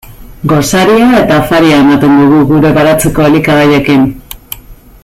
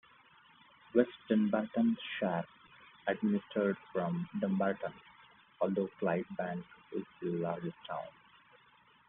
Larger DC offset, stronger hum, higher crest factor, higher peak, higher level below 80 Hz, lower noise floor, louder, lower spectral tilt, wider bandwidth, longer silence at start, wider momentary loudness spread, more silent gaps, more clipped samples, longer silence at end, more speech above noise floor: neither; neither; second, 8 dB vs 22 dB; first, 0 dBFS vs -14 dBFS; first, -30 dBFS vs -76 dBFS; second, -28 dBFS vs -65 dBFS; first, -7 LUFS vs -35 LUFS; about the same, -5.5 dB/octave vs -6 dB/octave; first, 16 kHz vs 3.9 kHz; second, 0.1 s vs 0.95 s; first, 16 LU vs 12 LU; neither; neither; second, 0.3 s vs 1 s; second, 22 dB vs 31 dB